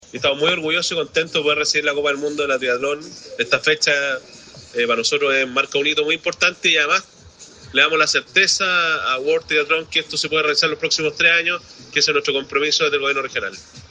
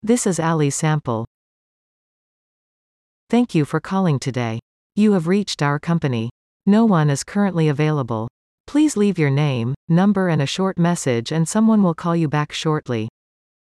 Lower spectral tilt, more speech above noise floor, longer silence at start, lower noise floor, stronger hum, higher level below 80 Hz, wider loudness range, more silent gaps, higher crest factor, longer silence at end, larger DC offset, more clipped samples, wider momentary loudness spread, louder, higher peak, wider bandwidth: second, -1.5 dB/octave vs -6 dB/octave; second, 24 dB vs over 72 dB; about the same, 0.15 s vs 0.05 s; second, -44 dBFS vs under -90 dBFS; neither; about the same, -60 dBFS vs -58 dBFS; about the same, 3 LU vs 5 LU; second, none vs 1.27-3.27 s, 4.62-4.90 s, 6.31-6.60 s, 8.30-8.64 s, 9.76-9.88 s; about the same, 20 dB vs 16 dB; second, 0.05 s vs 0.65 s; neither; neither; about the same, 8 LU vs 10 LU; about the same, -18 LUFS vs -19 LUFS; first, 0 dBFS vs -4 dBFS; second, 9.8 kHz vs 13 kHz